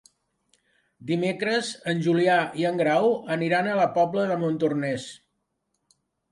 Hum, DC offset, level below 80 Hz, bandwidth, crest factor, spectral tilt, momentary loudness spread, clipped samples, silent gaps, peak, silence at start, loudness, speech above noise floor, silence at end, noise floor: none; under 0.1%; -72 dBFS; 11.5 kHz; 16 dB; -6 dB/octave; 8 LU; under 0.1%; none; -10 dBFS; 1 s; -24 LUFS; 53 dB; 1.15 s; -77 dBFS